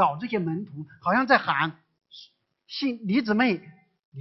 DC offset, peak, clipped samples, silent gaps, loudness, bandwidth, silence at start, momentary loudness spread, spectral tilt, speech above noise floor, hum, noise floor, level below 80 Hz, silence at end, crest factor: under 0.1%; -4 dBFS; under 0.1%; 4.05-4.12 s; -25 LUFS; 6 kHz; 0 s; 12 LU; -7 dB/octave; 31 dB; none; -56 dBFS; -68 dBFS; 0 s; 22 dB